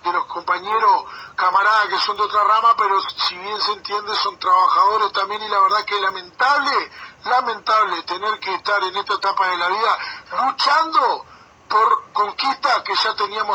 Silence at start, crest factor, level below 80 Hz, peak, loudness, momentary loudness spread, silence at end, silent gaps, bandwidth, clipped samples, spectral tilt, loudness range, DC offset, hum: 0.05 s; 14 dB; -66 dBFS; -4 dBFS; -18 LUFS; 8 LU; 0 s; none; 19 kHz; under 0.1%; -1.5 dB/octave; 2 LU; under 0.1%; none